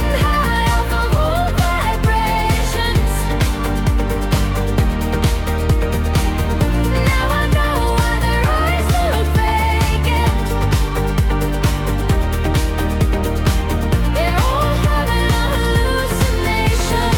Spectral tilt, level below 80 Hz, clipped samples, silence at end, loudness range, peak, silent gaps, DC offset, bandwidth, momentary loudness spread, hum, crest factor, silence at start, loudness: -5.5 dB/octave; -20 dBFS; under 0.1%; 0 s; 2 LU; -4 dBFS; none; under 0.1%; 18 kHz; 2 LU; none; 12 dB; 0 s; -17 LUFS